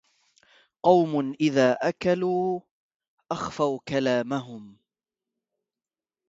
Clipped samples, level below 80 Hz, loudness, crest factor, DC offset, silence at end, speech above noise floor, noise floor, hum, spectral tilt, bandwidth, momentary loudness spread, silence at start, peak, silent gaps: under 0.1%; -64 dBFS; -25 LUFS; 22 dB; under 0.1%; 1.6 s; over 66 dB; under -90 dBFS; none; -6 dB/octave; 7.8 kHz; 12 LU; 0.85 s; -6 dBFS; 2.71-2.89 s, 2.96-3.00 s, 3.08-3.18 s